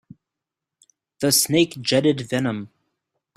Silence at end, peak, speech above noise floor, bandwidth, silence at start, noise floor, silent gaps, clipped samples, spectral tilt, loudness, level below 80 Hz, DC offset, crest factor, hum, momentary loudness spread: 0.7 s; -4 dBFS; 65 dB; 16 kHz; 1.2 s; -86 dBFS; none; under 0.1%; -3.5 dB/octave; -20 LUFS; -62 dBFS; under 0.1%; 18 dB; none; 9 LU